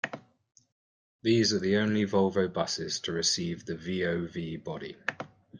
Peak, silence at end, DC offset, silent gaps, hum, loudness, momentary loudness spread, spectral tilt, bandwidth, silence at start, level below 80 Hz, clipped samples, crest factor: -12 dBFS; 0 s; under 0.1%; 0.72-1.19 s; none; -29 LUFS; 12 LU; -4 dB/octave; 10 kHz; 0.05 s; -66 dBFS; under 0.1%; 18 dB